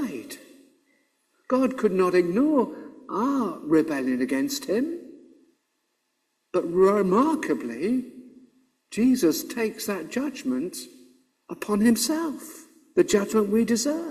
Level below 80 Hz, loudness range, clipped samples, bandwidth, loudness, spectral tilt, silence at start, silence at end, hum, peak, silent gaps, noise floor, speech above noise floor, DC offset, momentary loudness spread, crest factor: -64 dBFS; 3 LU; under 0.1%; 15.5 kHz; -24 LUFS; -5 dB/octave; 0 s; 0 s; none; -8 dBFS; none; -75 dBFS; 52 dB; under 0.1%; 16 LU; 18 dB